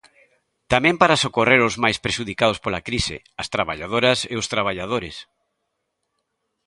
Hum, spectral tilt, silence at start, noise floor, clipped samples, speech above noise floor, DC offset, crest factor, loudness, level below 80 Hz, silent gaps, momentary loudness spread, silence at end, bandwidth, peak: none; -4 dB/octave; 0.7 s; -76 dBFS; under 0.1%; 55 dB; under 0.1%; 22 dB; -20 LUFS; -46 dBFS; none; 11 LU; 1.45 s; 11.5 kHz; 0 dBFS